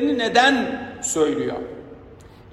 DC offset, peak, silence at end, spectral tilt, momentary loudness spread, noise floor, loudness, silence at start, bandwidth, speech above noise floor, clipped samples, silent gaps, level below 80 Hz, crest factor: under 0.1%; -2 dBFS; 0.1 s; -2.5 dB/octave; 17 LU; -44 dBFS; -20 LUFS; 0 s; 15 kHz; 24 dB; under 0.1%; none; -54 dBFS; 20 dB